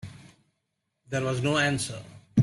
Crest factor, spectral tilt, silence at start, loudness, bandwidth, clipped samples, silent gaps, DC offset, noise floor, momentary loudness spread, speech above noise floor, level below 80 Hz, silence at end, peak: 18 dB; -5 dB/octave; 0.05 s; -28 LUFS; 12.5 kHz; under 0.1%; none; under 0.1%; -80 dBFS; 16 LU; 53 dB; -60 dBFS; 0 s; -10 dBFS